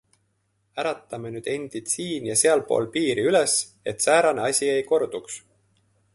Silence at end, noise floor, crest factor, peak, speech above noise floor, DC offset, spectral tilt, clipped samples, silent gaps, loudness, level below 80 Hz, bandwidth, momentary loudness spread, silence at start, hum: 0.75 s; -71 dBFS; 18 dB; -6 dBFS; 47 dB; under 0.1%; -2.5 dB/octave; under 0.1%; none; -23 LUFS; -66 dBFS; 12 kHz; 14 LU; 0.75 s; none